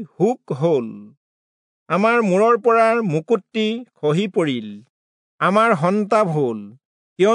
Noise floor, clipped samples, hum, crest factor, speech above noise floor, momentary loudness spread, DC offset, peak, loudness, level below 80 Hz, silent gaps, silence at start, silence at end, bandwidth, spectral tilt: under -90 dBFS; under 0.1%; none; 16 dB; over 72 dB; 8 LU; under 0.1%; -4 dBFS; -19 LUFS; -76 dBFS; 1.17-1.86 s, 4.90-5.38 s, 6.85-7.16 s; 0 s; 0 s; 10.5 kHz; -6.5 dB/octave